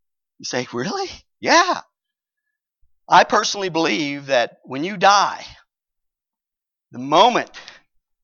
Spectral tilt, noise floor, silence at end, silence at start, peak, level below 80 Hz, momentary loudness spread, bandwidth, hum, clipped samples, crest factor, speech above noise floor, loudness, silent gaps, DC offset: -3 dB/octave; -87 dBFS; 0.6 s; 0.4 s; -2 dBFS; -62 dBFS; 13 LU; 7.4 kHz; none; under 0.1%; 20 dB; 69 dB; -18 LUFS; none; under 0.1%